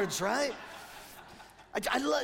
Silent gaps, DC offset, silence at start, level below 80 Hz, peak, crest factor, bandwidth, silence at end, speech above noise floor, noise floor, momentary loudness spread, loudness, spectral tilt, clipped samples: none; under 0.1%; 0 s; -62 dBFS; -16 dBFS; 18 dB; 16.5 kHz; 0 s; 22 dB; -53 dBFS; 20 LU; -33 LUFS; -3 dB/octave; under 0.1%